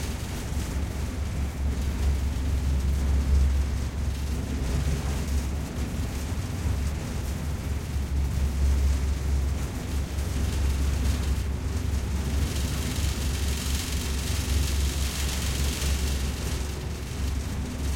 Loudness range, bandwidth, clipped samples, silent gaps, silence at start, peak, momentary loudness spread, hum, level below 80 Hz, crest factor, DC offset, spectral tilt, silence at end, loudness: 2 LU; 16.5 kHz; under 0.1%; none; 0 s; -12 dBFS; 5 LU; none; -28 dBFS; 14 dB; under 0.1%; -5 dB/octave; 0 s; -29 LUFS